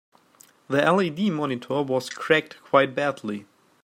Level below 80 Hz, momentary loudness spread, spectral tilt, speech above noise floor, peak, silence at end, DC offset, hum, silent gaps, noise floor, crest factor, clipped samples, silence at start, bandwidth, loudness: -72 dBFS; 8 LU; -5.5 dB/octave; 33 dB; -4 dBFS; 0.4 s; under 0.1%; none; none; -56 dBFS; 22 dB; under 0.1%; 0.7 s; 16 kHz; -24 LUFS